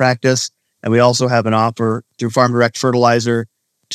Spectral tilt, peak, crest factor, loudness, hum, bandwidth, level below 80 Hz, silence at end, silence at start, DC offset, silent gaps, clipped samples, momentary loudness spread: -5 dB/octave; 0 dBFS; 16 dB; -15 LUFS; none; 13.5 kHz; -64 dBFS; 0 s; 0 s; under 0.1%; none; under 0.1%; 9 LU